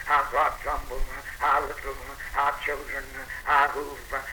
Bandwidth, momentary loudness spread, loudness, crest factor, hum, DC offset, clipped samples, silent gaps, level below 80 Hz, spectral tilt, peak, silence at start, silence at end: over 20 kHz; 14 LU; -27 LUFS; 18 dB; none; under 0.1%; under 0.1%; none; -40 dBFS; -3 dB/octave; -10 dBFS; 0 s; 0 s